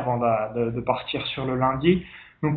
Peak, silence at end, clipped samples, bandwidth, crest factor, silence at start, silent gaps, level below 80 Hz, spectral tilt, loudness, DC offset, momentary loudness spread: -6 dBFS; 0 s; under 0.1%; 4.7 kHz; 18 dB; 0 s; none; -50 dBFS; -11 dB/octave; -25 LUFS; under 0.1%; 6 LU